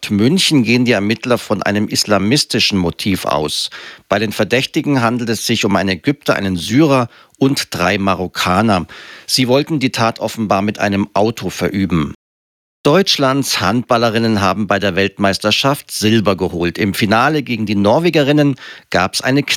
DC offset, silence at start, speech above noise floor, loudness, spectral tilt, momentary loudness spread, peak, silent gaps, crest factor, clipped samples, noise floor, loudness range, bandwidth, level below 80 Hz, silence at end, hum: under 0.1%; 0 s; over 75 dB; -15 LUFS; -4.5 dB/octave; 6 LU; 0 dBFS; 12.15-12.84 s; 14 dB; under 0.1%; under -90 dBFS; 2 LU; 17 kHz; -50 dBFS; 0 s; none